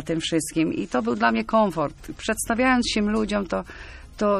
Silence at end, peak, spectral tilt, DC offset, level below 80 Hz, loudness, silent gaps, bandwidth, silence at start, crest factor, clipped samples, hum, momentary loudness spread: 0 s; -6 dBFS; -4.5 dB/octave; under 0.1%; -44 dBFS; -23 LUFS; none; 14 kHz; 0 s; 16 dB; under 0.1%; none; 10 LU